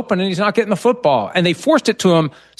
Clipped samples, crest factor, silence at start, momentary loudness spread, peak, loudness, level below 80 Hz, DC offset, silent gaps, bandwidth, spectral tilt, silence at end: under 0.1%; 14 dB; 0 s; 3 LU; -2 dBFS; -16 LUFS; -60 dBFS; under 0.1%; none; 12.5 kHz; -5.5 dB/octave; 0.3 s